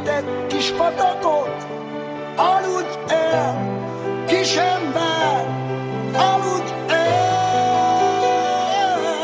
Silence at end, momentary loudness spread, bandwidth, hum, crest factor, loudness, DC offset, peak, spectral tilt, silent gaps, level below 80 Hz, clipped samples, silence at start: 0 s; 8 LU; 8 kHz; none; 16 dB; -20 LUFS; under 0.1%; -4 dBFS; -4.5 dB/octave; none; -58 dBFS; under 0.1%; 0 s